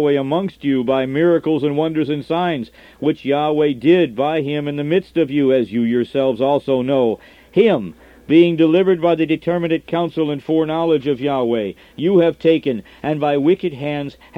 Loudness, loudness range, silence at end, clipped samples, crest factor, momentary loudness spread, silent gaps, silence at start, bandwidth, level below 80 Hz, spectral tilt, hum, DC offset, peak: -17 LUFS; 2 LU; 0 s; under 0.1%; 16 dB; 8 LU; none; 0 s; 5.6 kHz; -54 dBFS; -8.5 dB/octave; none; under 0.1%; -2 dBFS